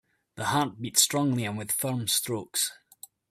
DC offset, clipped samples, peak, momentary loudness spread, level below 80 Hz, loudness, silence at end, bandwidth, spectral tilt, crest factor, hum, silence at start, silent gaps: under 0.1%; under 0.1%; -4 dBFS; 8 LU; -68 dBFS; -27 LUFS; 0.55 s; 16 kHz; -3 dB/octave; 24 dB; none; 0.35 s; none